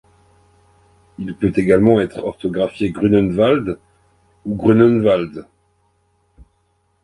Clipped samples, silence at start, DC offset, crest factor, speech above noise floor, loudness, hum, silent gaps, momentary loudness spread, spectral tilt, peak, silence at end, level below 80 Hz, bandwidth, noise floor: under 0.1%; 1.2 s; under 0.1%; 18 dB; 48 dB; -16 LUFS; none; none; 17 LU; -8.5 dB/octave; 0 dBFS; 1.6 s; -46 dBFS; 11 kHz; -63 dBFS